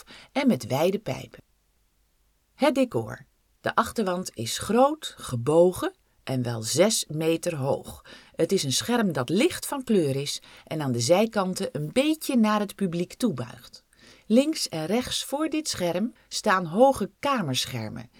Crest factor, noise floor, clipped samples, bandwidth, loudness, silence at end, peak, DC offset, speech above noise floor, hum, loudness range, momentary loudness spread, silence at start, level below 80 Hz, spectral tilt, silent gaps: 20 dB; -67 dBFS; under 0.1%; 18.5 kHz; -25 LUFS; 0.15 s; -4 dBFS; under 0.1%; 42 dB; none; 3 LU; 12 LU; 0.1 s; -58 dBFS; -4.5 dB/octave; none